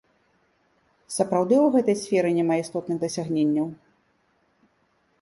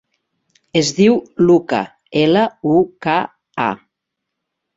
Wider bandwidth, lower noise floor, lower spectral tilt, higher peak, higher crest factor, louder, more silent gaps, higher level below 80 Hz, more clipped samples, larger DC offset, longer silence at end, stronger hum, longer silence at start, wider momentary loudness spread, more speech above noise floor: first, 11.5 kHz vs 7.8 kHz; second, -67 dBFS vs -79 dBFS; about the same, -6 dB/octave vs -5.5 dB/octave; second, -8 dBFS vs -2 dBFS; about the same, 18 dB vs 16 dB; second, -23 LUFS vs -16 LUFS; neither; second, -68 dBFS vs -56 dBFS; neither; neither; first, 1.45 s vs 1 s; neither; first, 1.1 s vs 0.75 s; about the same, 9 LU vs 8 LU; second, 45 dB vs 64 dB